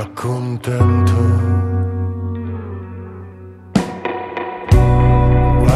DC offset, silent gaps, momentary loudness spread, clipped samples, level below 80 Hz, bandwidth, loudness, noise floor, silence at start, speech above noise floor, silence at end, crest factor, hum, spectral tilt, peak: under 0.1%; none; 17 LU; under 0.1%; -22 dBFS; 12 kHz; -17 LUFS; -35 dBFS; 0 s; 21 dB; 0 s; 16 dB; none; -8 dB/octave; 0 dBFS